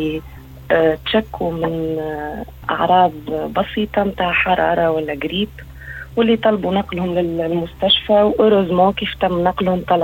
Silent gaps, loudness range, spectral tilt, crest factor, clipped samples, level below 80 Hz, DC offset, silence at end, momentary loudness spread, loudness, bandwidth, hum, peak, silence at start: none; 3 LU; -7 dB/octave; 14 dB; under 0.1%; -40 dBFS; under 0.1%; 0 s; 11 LU; -17 LUFS; 17.5 kHz; none; -2 dBFS; 0 s